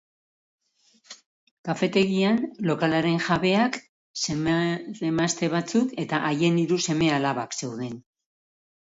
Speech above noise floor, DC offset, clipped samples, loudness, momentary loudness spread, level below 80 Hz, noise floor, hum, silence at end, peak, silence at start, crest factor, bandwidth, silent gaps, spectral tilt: 39 dB; under 0.1%; under 0.1%; -24 LUFS; 10 LU; -60 dBFS; -63 dBFS; none; 1 s; -8 dBFS; 1.1 s; 18 dB; 8 kHz; 1.26-1.64 s, 3.89-4.14 s; -5 dB/octave